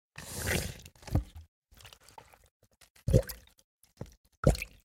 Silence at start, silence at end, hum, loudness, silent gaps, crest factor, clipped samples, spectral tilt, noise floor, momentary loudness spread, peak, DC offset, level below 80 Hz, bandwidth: 0.2 s; 0.15 s; none; -33 LUFS; 1.48-1.62 s, 2.51-2.60 s, 2.90-2.95 s, 3.64-3.79 s, 4.17-4.24 s, 4.37-4.43 s; 26 dB; under 0.1%; -5.5 dB/octave; -56 dBFS; 24 LU; -8 dBFS; under 0.1%; -42 dBFS; 17 kHz